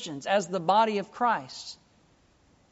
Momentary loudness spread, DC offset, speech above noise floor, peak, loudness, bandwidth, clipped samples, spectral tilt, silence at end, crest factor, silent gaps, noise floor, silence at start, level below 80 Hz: 17 LU; under 0.1%; 36 dB; -12 dBFS; -27 LUFS; 8 kHz; under 0.1%; -2.5 dB/octave; 1 s; 18 dB; none; -63 dBFS; 0 s; -72 dBFS